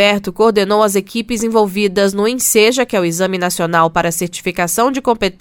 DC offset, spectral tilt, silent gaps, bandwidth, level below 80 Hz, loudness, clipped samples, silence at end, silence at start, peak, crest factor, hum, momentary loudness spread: under 0.1%; -3.5 dB/octave; none; 18.5 kHz; -44 dBFS; -14 LUFS; under 0.1%; 0.1 s; 0 s; 0 dBFS; 14 dB; none; 7 LU